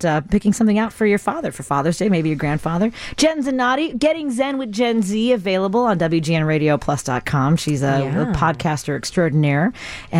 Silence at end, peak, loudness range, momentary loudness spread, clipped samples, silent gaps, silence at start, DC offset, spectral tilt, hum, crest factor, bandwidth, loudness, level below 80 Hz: 0 s; -4 dBFS; 1 LU; 4 LU; under 0.1%; none; 0 s; under 0.1%; -6 dB/octave; none; 14 dB; 15.5 kHz; -19 LUFS; -42 dBFS